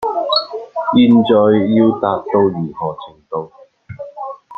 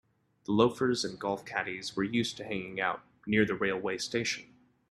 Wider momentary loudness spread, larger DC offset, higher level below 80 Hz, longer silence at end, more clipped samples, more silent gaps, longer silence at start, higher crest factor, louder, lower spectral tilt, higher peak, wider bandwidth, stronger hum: first, 19 LU vs 9 LU; neither; first, -56 dBFS vs -66 dBFS; second, 0.05 s vs 0.45 s; neither; neither; second, 0 s vs 0.5 s; second, 14 dB vs 22 dB; first, -14 LUFS vs -31 LUFS; first, -8.5 dB/octave vs -4.5 dB/octave; first, -2 dBFS vs -10 dBFS; second, 4.9 kHz vs 13 kHz; neither